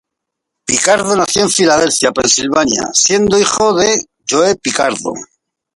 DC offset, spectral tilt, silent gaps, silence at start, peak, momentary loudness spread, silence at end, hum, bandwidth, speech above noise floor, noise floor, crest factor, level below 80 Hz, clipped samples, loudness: under 0.1%; -2 dB/octave; none; 0.7 s; 0 dBFS; 6 LU; 0.5 s; none; 11.5 kHz; 65 dB; -78 dBFS; 14 dB; -48 dBFS; under 0.1%; -12 LUFS